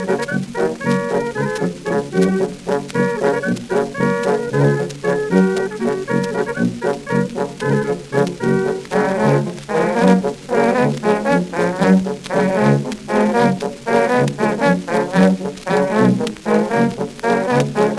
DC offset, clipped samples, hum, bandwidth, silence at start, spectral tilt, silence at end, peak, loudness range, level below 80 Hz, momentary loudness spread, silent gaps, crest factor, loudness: under 0.1%; under 0.1%; none; 12 kHz; 0 s; -6.5 dB/octave; 0 s; 0 dBFS; 3 LU; -50 dBFS; 6 LU; none; 16 dB; -18 LUFS